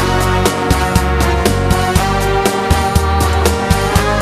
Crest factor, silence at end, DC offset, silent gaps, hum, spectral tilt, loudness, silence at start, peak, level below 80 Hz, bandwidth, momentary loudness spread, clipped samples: 12 dB; 0 s; under 0.1%; none; none; -5 dB/octave; -14 LUFS; 0 s; 0 dBFS; -20 dBFS; 14.5 kHz; 1 LU; under 0.1%